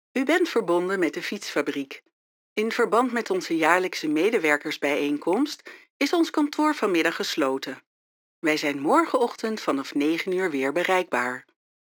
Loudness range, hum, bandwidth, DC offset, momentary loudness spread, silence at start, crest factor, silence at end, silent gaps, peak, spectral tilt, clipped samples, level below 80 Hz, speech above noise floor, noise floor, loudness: 2 LU; none; 19.5 kHz; under 0.1%; 9 LU; 0.15 s; 22 dB; 0.4 s; 2.13-2.56 s, 5.90-6.00 s, 7.86-8.42 s; -2 dBFS; -4 dB/octave; under 0.1%; -86 dBFS; over 66 dB; under -90 dBFS; -24 LUFS